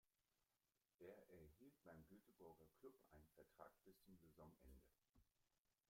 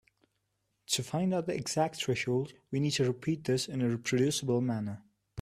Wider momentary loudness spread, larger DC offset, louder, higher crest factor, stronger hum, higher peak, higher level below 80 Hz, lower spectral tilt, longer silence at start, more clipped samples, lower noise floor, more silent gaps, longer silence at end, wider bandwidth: second, 3 LU vs 7 LU; neither; second, -68 LUFS vs -32 LUFS; about the same, 22 dB vs 18 dB; neither; second, -48 dBFS vs -16 dBFS; second, -82 dBFS vs -68 dBFS; first, -6.5 dB/octave vs -5 dB/octave; second, 0.05 s vs 0.9 s; neither; first, under -90 dBFS vs -80 dBFS; first, 0.95-0.99 s, 5.58-5.65 s vs none; first, 0.15 s vs 0 s; about the same, 16 kHz vs 15 kHz